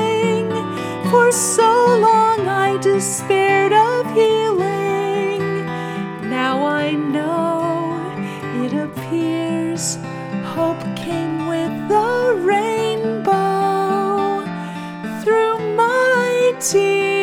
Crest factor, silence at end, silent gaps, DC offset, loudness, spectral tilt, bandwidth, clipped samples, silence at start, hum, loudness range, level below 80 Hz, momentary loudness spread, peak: 16 dB; 0 s; none; under 0.1%; -18 LUFS; -4.5 dB/octave; 17.5 kHz; under 0.1%; 0 s; none; 7 LU; -62 dBFS; 11 LU; -2 dBFS